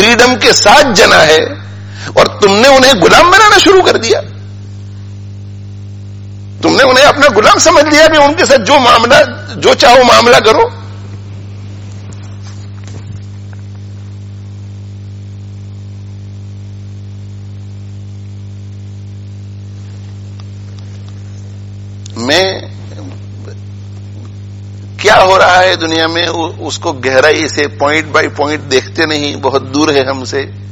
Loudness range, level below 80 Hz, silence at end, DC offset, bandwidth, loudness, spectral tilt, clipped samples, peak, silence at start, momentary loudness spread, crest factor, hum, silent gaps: 22 LU; -38 dBFS; 0 s; under 0.1%; over 20 kHz; -7 LUFS; -3.5 dB/octave; 2%; 0 dBFS; 0 s; 23 LU; 10 dB; 50 Hz at -25 dBFS; none